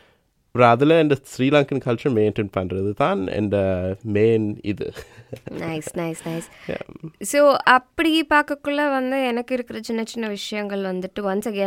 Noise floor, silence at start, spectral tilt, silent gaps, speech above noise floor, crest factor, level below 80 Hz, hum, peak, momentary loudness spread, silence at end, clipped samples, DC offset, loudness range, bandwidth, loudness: -61 dBFS; 0.55 s; -5.5 dB/octave; none; 41 dB; 20 dB; -54 dBFS; none; -2 dBFS; 15 LU; 0 s; under 0.1%; under 0.1%; 5 LU; 16.5 kHz; -21 LUFS